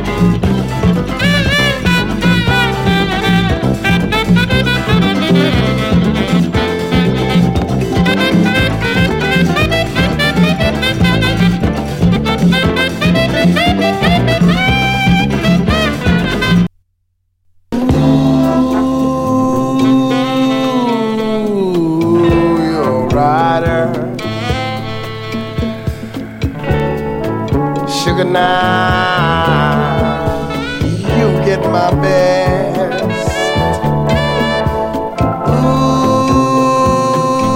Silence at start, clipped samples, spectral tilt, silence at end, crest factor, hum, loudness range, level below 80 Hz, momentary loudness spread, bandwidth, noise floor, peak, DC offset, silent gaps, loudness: 0 s; under 0.1%; -6 dB/octave; 0 s; 12 dB; none; 3 LU; -28 dBFS; 6 LU; 16.5 kHz; -63 dBFS; 0 dBFS; under 0.1%; none; -13 LUFS